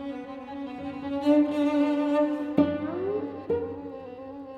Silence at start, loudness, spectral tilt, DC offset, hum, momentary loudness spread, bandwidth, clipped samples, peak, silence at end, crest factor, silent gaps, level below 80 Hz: 0 s; -27 LUFS; -7.5 dB/octave; under 0.1%; none; 16 LU; 7 kHz; under 0.1%; -8 dBFS; 0 s; 20 dB; none; -62 dBFS